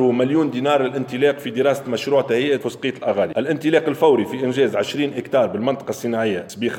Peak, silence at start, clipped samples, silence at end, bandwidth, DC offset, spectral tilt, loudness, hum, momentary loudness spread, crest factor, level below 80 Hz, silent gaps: -4 dBFS; 0 s; under 0.1%; 0 s; 17 kHz; under 0.1%; -5.5 dB/octave; -20 LUFS; none; 6 LU; 16 dB; -68 dBFS; none